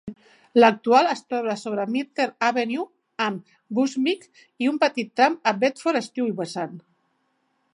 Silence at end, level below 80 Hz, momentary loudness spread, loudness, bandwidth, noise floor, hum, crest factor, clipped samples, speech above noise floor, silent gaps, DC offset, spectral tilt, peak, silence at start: 0.95 s; -72 dBFS; 13 LU; -23 LUFS; 11 kHz; -70 dBFS; none; 20 dB; under 0.1%; 48 dB; none; under 0.1%; -4.5 dB/octave; -4 dBFS; 0.05 s